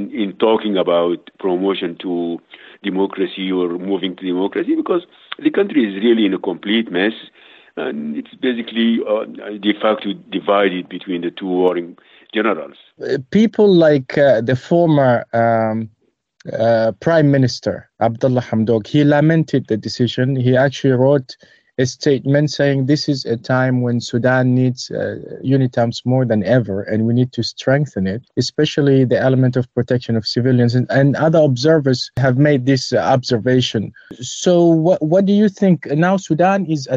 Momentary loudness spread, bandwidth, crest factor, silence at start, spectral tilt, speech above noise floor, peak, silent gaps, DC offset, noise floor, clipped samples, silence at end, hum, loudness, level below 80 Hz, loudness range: 10 LU; 7.8 kHz; 12 dB; 0 s; -6.5 dB/octave; 40 dB; -4 dBFS; none; under 0.1%; -56 dBFS; under 0.1%; 0 s; none; -16 LUFS; -58 dBFS; 5 LU